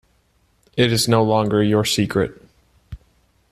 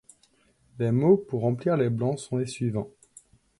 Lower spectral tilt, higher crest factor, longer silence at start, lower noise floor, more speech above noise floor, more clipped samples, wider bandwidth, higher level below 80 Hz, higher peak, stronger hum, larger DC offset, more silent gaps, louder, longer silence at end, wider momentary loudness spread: second, -5 dB/octave vs -8 dB/octave; about the same, 18 dB vs 18 dB; about the same, 0.75 s vs 0.75 s; about the same, -61 dBFS vs -64 dBFS; first, 44 dB vs 39 dB; neither; first, 14 kHz vs 11.5 kHz; first, -48 dBFS vs -62 dBFS; first, -2 dBFS vs -8 dBFS; neither; neither; neither; first, -18 LUFS vs -26 LUFS; second, 0.55 s vs 0.7 s; about the same, 7 LU vs 9 LU